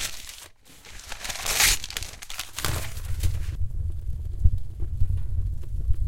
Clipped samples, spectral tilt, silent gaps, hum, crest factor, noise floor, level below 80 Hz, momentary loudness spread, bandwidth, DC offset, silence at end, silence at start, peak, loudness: under 0.1%; -2 dB/octave; none; none; 22 dB; -47 dBFS; -30 dBFS; 20 LU; 17 kHz; under 0.1%; 0 s; 0 s; -2 dBFS; -28 LUFS